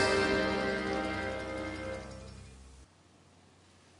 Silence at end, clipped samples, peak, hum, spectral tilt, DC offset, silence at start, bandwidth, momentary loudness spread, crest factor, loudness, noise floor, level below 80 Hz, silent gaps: 1.15 s; under 0.1%; -14 dBFS; none; -4.5 dB/octave; under 0.1%; 0 s; 11 kHz; 22 LU; 20 dB; -33 LUFS; -62 dBFS; -52 dBFS; none